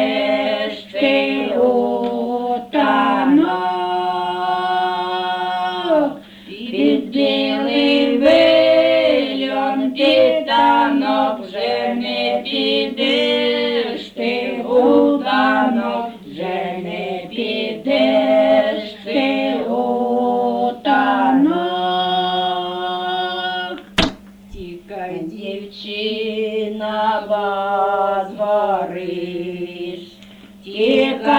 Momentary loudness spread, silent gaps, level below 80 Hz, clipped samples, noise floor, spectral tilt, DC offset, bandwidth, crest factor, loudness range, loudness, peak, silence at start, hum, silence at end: 11 LU; none; -50 dBFS; under 0.1%; -41 dBFS; -5.5 dB/octave; under 0.1%; 11 kHz; 16 dB; 7 LU; -17 LUFS; 0 dBFS; 0 s; none; 0 s